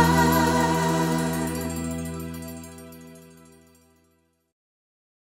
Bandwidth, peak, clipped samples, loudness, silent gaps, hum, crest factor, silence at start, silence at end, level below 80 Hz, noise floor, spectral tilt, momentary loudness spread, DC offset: 16 kHz; -6 dBFS; under 0.1%; -24 LUFS; none; none; 20 dB; 0 s; 2.15 s; -44 dBFS; -67 dBFS; -5 dB/octave; 23 LU; under 0.1%